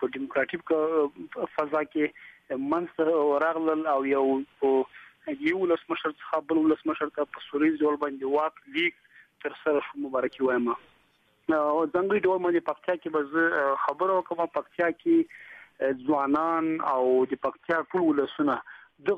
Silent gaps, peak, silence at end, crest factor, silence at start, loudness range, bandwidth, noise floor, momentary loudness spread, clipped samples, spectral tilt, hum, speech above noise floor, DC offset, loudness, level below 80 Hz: none; -12 dBFS; 0 s; 14 dB; 0 s; 2 LU; 5.2 kHz; -66 dBFS; 7 LU; under 0.1%; -7 dB/octave; none; 40 dB; under 0.1%; -27 LUFS; -70 dBFS